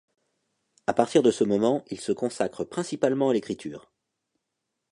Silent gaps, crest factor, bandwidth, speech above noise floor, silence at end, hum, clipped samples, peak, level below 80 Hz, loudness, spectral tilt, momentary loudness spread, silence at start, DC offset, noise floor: none; 22 dB; 11 kHz; 57 dB; 1.15 s; none; under 0.1%; -6 dBFS; -68 dBFS; -26 LUFS; -5.5 dB/octave; 13 LU; 0.9 s; under 0.1%; -82 dBFS